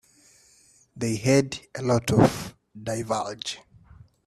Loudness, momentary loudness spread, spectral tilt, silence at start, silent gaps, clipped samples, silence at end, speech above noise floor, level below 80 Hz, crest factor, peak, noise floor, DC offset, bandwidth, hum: -25 LUFS; 16 LU; -5.5 dB/octave; 0.95 s; none; under 0.1%; 0.65 s; 35 dB; -54 dBFS; 22 dB; -4 dBFS; -59 dBFS; under 0.1%; 14 kHz; none